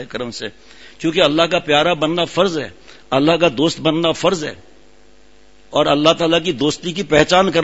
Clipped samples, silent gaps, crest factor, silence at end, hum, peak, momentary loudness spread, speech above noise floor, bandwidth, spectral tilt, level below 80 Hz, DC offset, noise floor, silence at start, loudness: under 0.1%; none; 18 dB; 0 s; none; 0 dBFS; 12 LU; 34 dB; 8 kHz; -4.5 dB/octave; -46 dBFS; 0.6%; -50 dBFS; 0 s; -16 LUFS